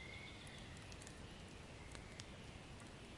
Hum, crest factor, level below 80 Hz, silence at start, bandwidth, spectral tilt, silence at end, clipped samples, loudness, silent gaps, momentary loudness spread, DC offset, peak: none; 26 dB; -64 dBFS; 0 s; 11.5 kHz; -4 dB/octave; 0 s; under 0.1%; -55 LUFS; none; 3 LU; under 0.1%; -28 dBFS